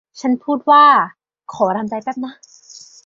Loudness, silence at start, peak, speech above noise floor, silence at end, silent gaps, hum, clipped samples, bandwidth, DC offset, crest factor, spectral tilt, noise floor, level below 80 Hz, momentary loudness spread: -15 LUFS; 0.15 s; -2 dBFS; 27 dB; 0.3 s; none; none; under 0.1%; 7.6 kHz; under 0.1%; 16 dB; -4.5 dB/octave; -42 dBFS; -66 dBFS; 19 LU